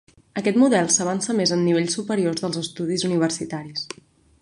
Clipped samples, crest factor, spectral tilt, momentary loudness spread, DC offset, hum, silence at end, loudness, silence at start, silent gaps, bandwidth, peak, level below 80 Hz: under 0.1%; 18 dB; -4 dB/octave; 13 LU; under 0.1%; none; 0.55 s; -22 LUFS; 0.35 s; none; 11.5 kHz; -6 dBFS; -64 dBFS